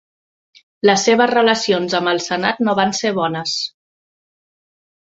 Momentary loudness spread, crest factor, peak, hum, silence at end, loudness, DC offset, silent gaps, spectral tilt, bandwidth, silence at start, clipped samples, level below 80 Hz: 7 LU; 18 dB; 0 dBFS; none; 1.35 s; -17 LUFS; under 0.1%; none; -3.5 dB/octave; 8 kHz; 0.85 s; under 0.1%; -62 dBFS